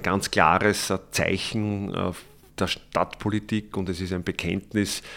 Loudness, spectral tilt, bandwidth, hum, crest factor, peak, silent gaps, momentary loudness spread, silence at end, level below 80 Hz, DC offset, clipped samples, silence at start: -25 LUFS; -4.5 dB/octave; 17.5 kHz; none; 24 dB; -2 dBFS; none; 10 LU; 0 s; -50 dBFS; under 0.1%; under 0.1%; 0 s